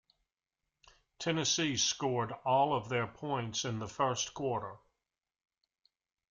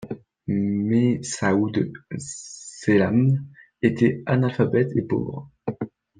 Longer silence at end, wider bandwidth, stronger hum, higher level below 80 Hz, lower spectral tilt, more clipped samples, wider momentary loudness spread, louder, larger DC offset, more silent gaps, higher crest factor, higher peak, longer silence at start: first, 1.55 s vs 0.35 s; about the same, 10.5 kHz vs 9.8 kHz; neither; second, -70 dBFS vs -58 dBFS; second, -3.5 dB/octave vs -7 dB/octave; neither; second, 8 LU vs 14 LU; second, -33 LUFS vs -23 LUFS; neither; neither; about the same, 18 dB vs 18 dB; second, -18 dBFS vs -4 dBFS; first, 1.2 s vs 0 s